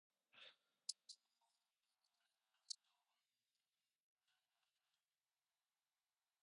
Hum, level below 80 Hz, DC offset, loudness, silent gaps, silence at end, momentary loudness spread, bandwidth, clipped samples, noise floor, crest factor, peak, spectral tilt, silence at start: none; under -90 dBFS; under 0.1%; -57 LUFS; none; 3.7 s; 12 LU; 10 kHz; under 0.1%; under -90 dBFS; 36 dB; -30 dBFS; 4 dB/octave; 0.35 s